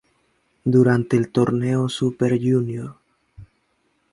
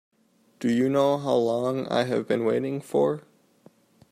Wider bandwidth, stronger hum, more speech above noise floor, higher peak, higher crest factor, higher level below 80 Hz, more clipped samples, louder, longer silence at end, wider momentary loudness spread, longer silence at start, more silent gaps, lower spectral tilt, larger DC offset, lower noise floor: second, 11.5 kHz vs 14.5 kHz; neither; first, 48 dB vs 40 dB; first, -4 dBFS vs -10 dBFS; about the same, 18 dB vs 16 dB; first, -56 dBFS vs -70 dBFS; neither; first, -20 LUFS vs -25 LUFS; second, 0.7 s vs 0.9 s; first, 11 LU vs 5 LU; about the same, 0.65 s vs 0.6 s; neither; about the same, -7.5 dB/octave vs -6.5 dB/octave; neither; about the same, -67 dBFS vs -64 dBFS